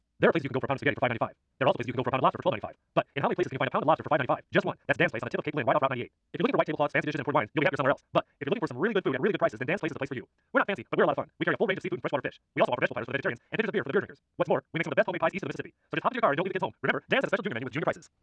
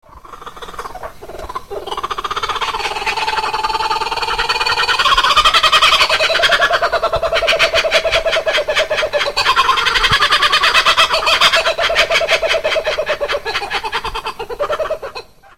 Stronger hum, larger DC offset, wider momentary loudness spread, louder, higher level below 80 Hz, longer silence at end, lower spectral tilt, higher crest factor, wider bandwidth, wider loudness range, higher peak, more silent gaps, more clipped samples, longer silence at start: neither; second, under 0.1% vs 1%; second, 7 LU vs 17 LU; second, -29 LUFS vs -13 LUFS; second, -68 dBFS vs -36 dBFS; first, 0.15 s vs 0 s; first, -7 dB/octave vs -1 dB/octave; about the same, 20 dB vs 16 dB; second, 9 kHz vs 16.5 kHz; second, 2 LU vs 8 LU; second, -10 dBFS vs 0 dBFS; neither; neither; first, 0.2 s vs 0.05 s